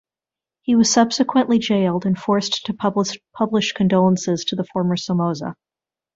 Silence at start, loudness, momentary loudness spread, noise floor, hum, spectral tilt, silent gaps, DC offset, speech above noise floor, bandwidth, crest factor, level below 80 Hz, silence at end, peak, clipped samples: 0.7 s; -19 LUFS; 8 LU; -90 dBFS; none; -5 dB/octave; none; under 0.1%; 71 dB; 7.8 kHz; 18 dB; -60 dBFS; 0.6 s; -2 dBFS; under 0.1%